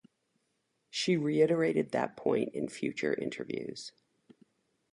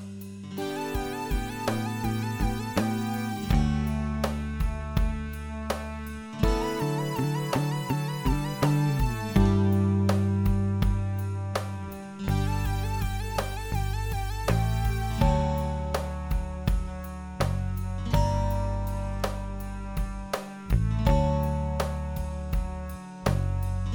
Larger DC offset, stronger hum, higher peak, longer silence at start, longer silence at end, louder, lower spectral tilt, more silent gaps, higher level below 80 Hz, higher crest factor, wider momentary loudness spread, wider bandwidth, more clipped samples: neither; neither; second, -14 dBFS vs -8 dBFS; first, 0.95 s vs 0 s; first, 1.05 s vs 0 s; second, -32 LUFS vs -29 LUFS; about the same, -5.5 dB/octave vs -6.5 dB/octave; neither; second, -74 dBFS vs -32 dBFS; about the same, 18 dB vs 20 dB; about the same, 12 LU vs 10 LU; second, 11.5 kHz vs over 20 kHz; neither